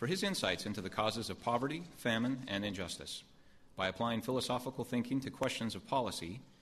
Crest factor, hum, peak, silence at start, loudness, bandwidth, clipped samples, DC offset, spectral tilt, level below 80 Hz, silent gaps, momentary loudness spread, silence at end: 18 dB; none; -18 dBFS; 0 s; -37 LUFS; 13.5 kHz; under 0.1%; under 0.1%; -4.5 dB/octave; -66 dBFS; none; 7 LU; 0.1 s